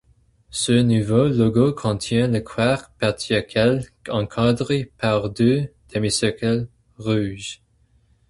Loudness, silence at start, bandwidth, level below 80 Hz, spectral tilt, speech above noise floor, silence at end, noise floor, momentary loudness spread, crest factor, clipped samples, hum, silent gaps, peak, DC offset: -21 LUFS; 0.55 s; 11.5 kHz; -48 dBFS; -5.5 dB/octave; 40 dB; 0.75 s; -60 dBFS; 10 LU; 18 dB; under 0.1%; none; none; -4 dBFS; under 0.1%